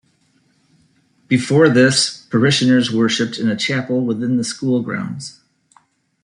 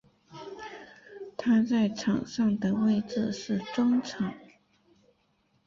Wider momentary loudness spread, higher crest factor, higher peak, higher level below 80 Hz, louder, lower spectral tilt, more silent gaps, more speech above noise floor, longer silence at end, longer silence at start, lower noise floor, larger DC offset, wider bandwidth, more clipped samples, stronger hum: second, 11 LU vs 20 LU; about the same, 16 dB vs 14 dB; first, -2 dBFS vs -16 dBFS; about the same, -60 dBFS vs -64 dBFS; first, -16 LUFS vs -28 LUFS; second, -4.5 dB/octave vs -6.5 dB/octave; neither; about the same, 44 dB vs 44 dB; second, 0.95 s vs 1.2 s; first, 1.3 s vs 0.3 s; second, -60 dBFS vs -70 dBFS; neither; first, 11 kHz vs 7.4 kHz; neither; neither